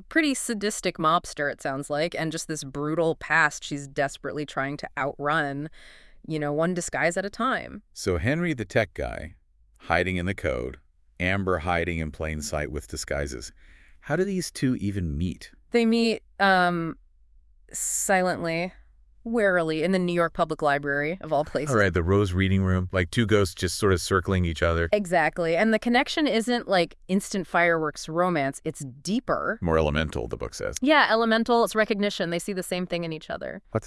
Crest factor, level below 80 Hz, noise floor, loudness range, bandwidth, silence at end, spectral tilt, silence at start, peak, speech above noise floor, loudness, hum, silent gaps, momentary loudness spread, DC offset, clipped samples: 20 dB; -46 dBFS; -56 dBFS; 5 LU; 12 kHz; 0 s; -5 dB/octave; 0 s; -4 dBFS; 31 dB; -25 LUFS; none; none; 11 LU; under 0.1%; under 0.1%